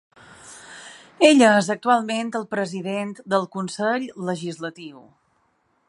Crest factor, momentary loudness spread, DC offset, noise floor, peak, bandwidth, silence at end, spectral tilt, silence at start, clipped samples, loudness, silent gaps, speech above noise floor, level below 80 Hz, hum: 20 dB; 25 LU; under 0.1%; -67 dBFS; -2 dBFS; 11.5 kHz; 0.9 s; -4.5 dB/octave; 0.45 s; under 0.1%; -21 LUFS; none; 45 dB; -72 dBFS; none